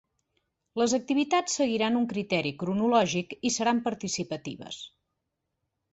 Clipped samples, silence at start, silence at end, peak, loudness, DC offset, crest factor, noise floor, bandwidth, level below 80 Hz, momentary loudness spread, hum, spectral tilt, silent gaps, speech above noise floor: under 0.1%; 0.75 s; 1.05 s; -10 dBFS; -27 LUFS; under 0.1%; 20 dB; -82 dBFS; 8.2 kHz; -68 dBFS; 14 LU; none; -4 dB/octave; none; 55 dB